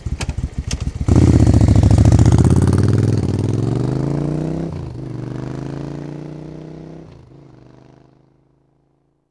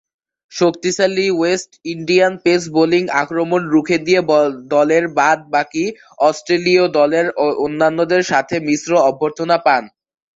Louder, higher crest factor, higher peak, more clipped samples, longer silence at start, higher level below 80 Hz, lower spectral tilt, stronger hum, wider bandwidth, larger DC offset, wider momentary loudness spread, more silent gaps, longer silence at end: about the same, -16 LUFS vs -16 LUFS; about the same, 16 dB vs 16 dB; about the same, 0 dBFS vs 0 dBFS; first, 0.2% vs under 0.1%; second, 0 s vs 0.5 s; first, -26 dBFS vs -60 dBFS; first, -8 dB/octave vs -4.5 dB/octave; neither; first, 11 kHz vs 8 kHz; neither; first, 20 LU vs 5 LU; neither; first, 2.3 s vs 0.5 s